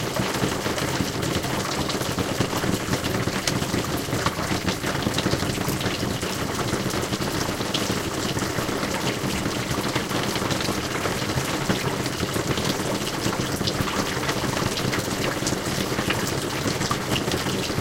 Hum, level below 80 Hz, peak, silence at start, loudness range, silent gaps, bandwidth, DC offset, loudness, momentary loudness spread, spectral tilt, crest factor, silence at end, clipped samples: none; -42 dBFS; -4 dBFS; 0 s; 1 LU; none; 17 kHz; under 0.1%; -25 LUFS; 2 LU; -4 dB/octave; 20 dB; 0 s; under 0.1%